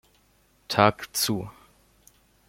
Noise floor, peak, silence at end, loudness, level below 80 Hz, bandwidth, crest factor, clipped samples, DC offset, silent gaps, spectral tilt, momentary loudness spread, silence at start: -63 dBFS; -2 dBFS; 0.95 s; -24 LUFS; -60 dBFS; 16.5 kHz; 26 dB; under 0.1%; under 0.1%; none; -3.5 dB/octave; 11 LU; 0.7 s